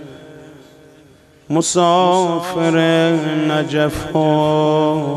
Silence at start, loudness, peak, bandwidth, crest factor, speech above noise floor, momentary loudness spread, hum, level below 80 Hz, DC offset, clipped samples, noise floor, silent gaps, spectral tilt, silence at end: 0 s; -15 LUFS; -2 dBFS; 13.5 kHz; 14 dB; 32 dB; 5 LU; none; -46 dBFS; under 0.1%; under 0.1%; -47 dBFS; none; -5 dB/octave; 0 s